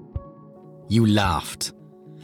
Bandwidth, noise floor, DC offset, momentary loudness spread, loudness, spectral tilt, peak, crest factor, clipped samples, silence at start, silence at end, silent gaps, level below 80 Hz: 17 kHz; -45 dBFS; under 0.1%; 17 LU; -22 LUFS; -5.5 dB/octave; -6 dBFS; 18 dB; under 0.1%; 0 s; 0 s; none; -44 dBFS